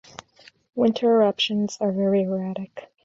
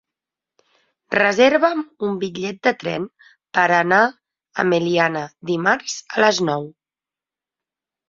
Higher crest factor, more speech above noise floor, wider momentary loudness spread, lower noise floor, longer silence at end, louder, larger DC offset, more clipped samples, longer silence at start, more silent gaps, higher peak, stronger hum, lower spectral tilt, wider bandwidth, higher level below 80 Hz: about the same, 16 dB vs 20 dB; second, 32 dB vs over 71 dB; first, 15 LU vs 12 LU; second, -54 dBFS vs under -90 dBFS; second, 0.2 s vs 1.4 s; second, -22 LUFS vs -19 LUFS; neither; neither; second, 0.75 s vs 1.1 s; neither; second, -8 dBFS vs -2 dBFS; neither; first, -6 dB/octave vs -4.5 dB/octave; about the same, 7.8 kHz vs 7.6 kHz; about the same, -68 dBFS vs -64 dBFS